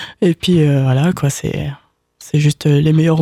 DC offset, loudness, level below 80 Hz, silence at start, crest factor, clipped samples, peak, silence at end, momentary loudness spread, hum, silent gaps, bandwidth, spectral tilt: under 0.1%; -15 LUFS; -44 dBFS; 0 s; 12 dB; under 0.1%; -4 dBFS; 0 s; 9 LU; none; none; 13.5 kHz; -6.5 dB/octave